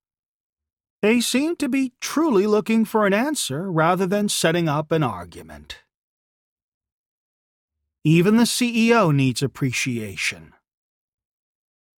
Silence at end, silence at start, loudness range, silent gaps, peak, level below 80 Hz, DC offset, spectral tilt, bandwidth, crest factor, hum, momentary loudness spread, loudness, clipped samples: 1.55 s; 1.05 s; 6 LU; 5.96-6.56 s, 6.63-6.81 s, 6.92-7.68 s; -4 dBFS; -60 dBFS; under 0.1%; -5 dB/octave; 18 kHz; 18 dB; none; 9 LU; -20 LUFS; under 0.1%